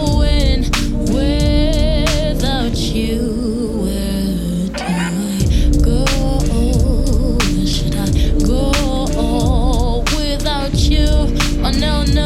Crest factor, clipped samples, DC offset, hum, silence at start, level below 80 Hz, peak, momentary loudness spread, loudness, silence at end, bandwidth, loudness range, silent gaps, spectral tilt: 12 dB; under 0.1%; under 0.1%; none; 0 s; -16 dBFS; -2 dBFS; 4 LU; -17 LUFS; 0 s; 14.5 kHz; 2 LU; none; -5.5 dB/octave